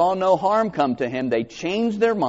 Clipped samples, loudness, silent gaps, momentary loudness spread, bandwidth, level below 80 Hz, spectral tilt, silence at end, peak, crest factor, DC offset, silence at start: under 0.1%; -21 LUFS; none; 6 LU; 8 kHz; -58 dBFS; -4.5 dB/octave; 0 s; -6 dBFS; 14 dB; under 0.1%; 0 s